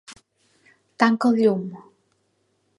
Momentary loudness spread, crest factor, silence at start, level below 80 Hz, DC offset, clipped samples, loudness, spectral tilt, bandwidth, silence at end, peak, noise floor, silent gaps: 11 LU; 24 dB; 0.1 s; -74 dBFS; under 0.1%; under 0.1%; -20 LUFS; -6.5 dB/octave; 11.5 kHz; 1 s; -2 dBFS; -69 dBFS; none